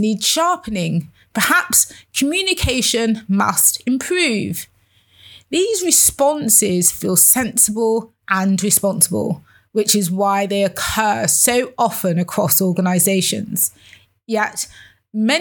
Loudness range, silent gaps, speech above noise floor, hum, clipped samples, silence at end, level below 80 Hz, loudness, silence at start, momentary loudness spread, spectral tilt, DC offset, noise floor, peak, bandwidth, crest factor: 4 LU; none; 37 dB; none; under 0.1%; 0 s; -44 dBFS; -16 LUFS; 0 s; 10 LU; -3 dB/octave; under 0.1%; -54 dBFS; 0 dBFS; over 20 kHz; 18 dB